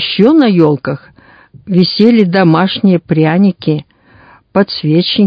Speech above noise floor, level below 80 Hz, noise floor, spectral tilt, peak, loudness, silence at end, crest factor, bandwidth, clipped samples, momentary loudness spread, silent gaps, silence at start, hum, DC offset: 33 dB; -52 dBFS; -43 dBFS; -9 dB/octave; 0 dBFS; -11 LUFS; 0 s; 10 dB; 5.2 kHz; 0.6%; 9 LU; none; 0 s; none; under 0.1%